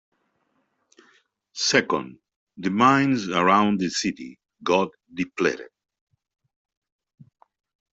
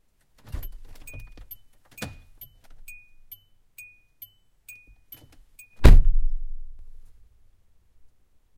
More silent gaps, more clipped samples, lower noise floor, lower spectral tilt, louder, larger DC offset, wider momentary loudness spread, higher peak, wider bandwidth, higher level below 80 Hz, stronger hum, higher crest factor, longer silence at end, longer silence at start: first, 2.36-2.47 s vs none; neither; first, -71 dBFS vs -60 dBFS; second, -4 dB/octave vs -6.5 dB/octave; about the same, -22 LUFS vs -24 LUFS; neither; second, 17 LU vs 28 LU; about the same, -4 dBFS vs -2 dBFS; second, 8.2 kHz vs 15.5 kHz; second, -66 dBFS vs -26 dBFS; neither; about the same, 22 dB vs 22 dB; first, 2.3 s vs 1.85 s; first, 1.55 s vs 0.55 s